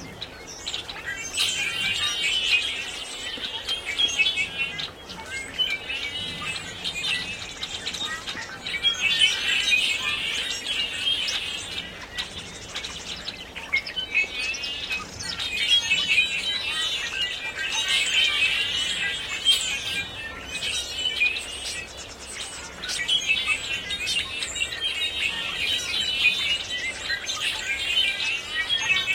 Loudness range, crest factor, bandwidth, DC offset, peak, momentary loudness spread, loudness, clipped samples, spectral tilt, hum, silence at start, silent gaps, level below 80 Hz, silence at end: 6 LU; 20 dB; 16.5 kHz; under 0.1%; -8 dBFS; 13 LU; -24 LUFS; under 0.1%; 0 dB/octave; none; 0 s; none; -52 dBFS; 0 s